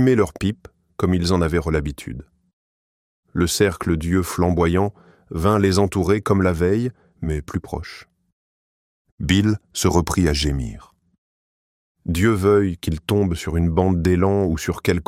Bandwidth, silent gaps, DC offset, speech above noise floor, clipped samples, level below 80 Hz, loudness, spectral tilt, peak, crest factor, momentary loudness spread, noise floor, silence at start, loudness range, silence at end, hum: 16 kHz; 2.53-3.23 s, 8.32-9.05 s, 9.12-9.18 s, 11.18-11.95 s; under 0.1%; over 71 dB; under 0.1%; -34 dBFS; -20 LUFS; -6 dB/octave; -2 dBFS; 18 dB; 14 LU; under -90 dBFS; 0 s; 4 LU; 0.05 s; none